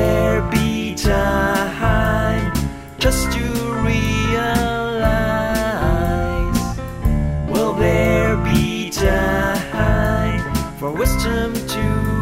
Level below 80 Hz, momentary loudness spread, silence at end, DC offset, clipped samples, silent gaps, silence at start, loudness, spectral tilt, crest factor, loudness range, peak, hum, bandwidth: -24 dBFS; 5 LU; 0 s; under 0.1%; under 0.1%; none; 0 s; -19 LUFS; -5.5 dB/octave; 14 dB; 2 LU; -2 dBFS; none; 16.5 kHz